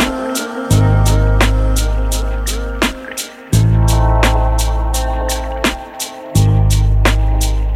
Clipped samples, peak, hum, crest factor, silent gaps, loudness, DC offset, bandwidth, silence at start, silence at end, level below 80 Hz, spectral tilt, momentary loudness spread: under 0.1%; -2 dBFS; none; 12 dB; none; -15 LUFS; under 0.1%; 15.5 kHz; 0 s; 0 s; -16 dBFS; -5 dB/octave; 8 LU